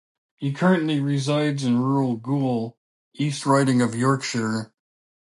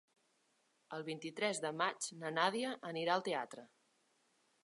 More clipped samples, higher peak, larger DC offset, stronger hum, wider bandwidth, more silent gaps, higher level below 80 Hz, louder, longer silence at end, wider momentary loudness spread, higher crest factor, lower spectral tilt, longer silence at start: neither; first, -6 dBFS vs -18 dBFS; neither; neither; about the same, 11.5 kHz vs 11.5 kHz; first, 2.77-3.11 s vs none; first, -68 dBFS vs under -90 dBFS; first, -23 LUFS vs -39 LUFS; second, 0.55 s vs 1 s; about the same, 10 LU vs 12 LU; second, 16 dB vs 24 dB; first, -6 dB/octave vs -3 dB/octave; second, 0.4 s vs 0.9 s